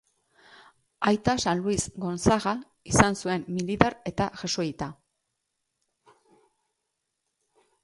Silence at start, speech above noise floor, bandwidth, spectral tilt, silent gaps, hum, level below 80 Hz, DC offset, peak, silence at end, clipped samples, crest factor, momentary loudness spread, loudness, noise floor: 1 s; 55 dB; 11.5 kHz; -4.5 dB/octave; none; none; -48 dBFS; under 0.1%; 0 dBFS; 2.9 s; under 0.1%; 28 dB; 9 LU; -26 LUFS; -81 dBFS